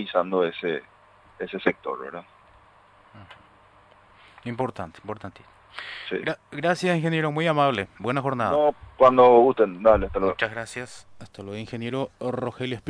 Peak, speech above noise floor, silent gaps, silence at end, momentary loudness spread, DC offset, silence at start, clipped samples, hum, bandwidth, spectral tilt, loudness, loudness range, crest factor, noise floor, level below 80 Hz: -4 dBFS; 31 dB; none; 0 s; 19 LU; under 0.1%; 0 s; under 0.1%; none; 10.5 kHz; -6.5 dB/octave; -23 LUFS; 17 LU; 20 dB; -55 dBFS; -50 dBFS